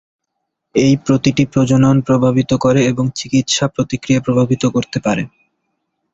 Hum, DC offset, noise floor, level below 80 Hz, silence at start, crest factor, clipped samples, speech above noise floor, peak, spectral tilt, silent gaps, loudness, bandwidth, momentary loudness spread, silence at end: none; under 0.1%; -75 dBFS; -46 dBFS; 0.75 s; 14 dB; under 0.1%; 61 dB; -2 dBFS; -6 dB/octave; none; -15 LUFS; 8 kHz; 7 LU; 0.85 s